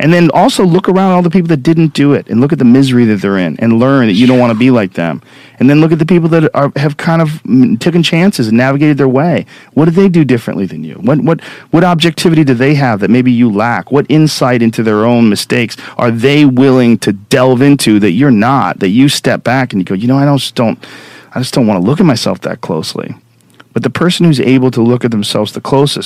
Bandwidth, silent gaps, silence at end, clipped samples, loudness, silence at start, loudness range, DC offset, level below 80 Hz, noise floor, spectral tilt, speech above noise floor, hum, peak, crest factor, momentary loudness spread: 15 kHz; none; 0 s; 2%; -9 LUFS; 0 s; 4 LU; under 0.1%; -48 dBFS; -43 dBFS; -6.5 dB/octave; 34 dB; none; 0 dBFS; 8 dB; 8 LU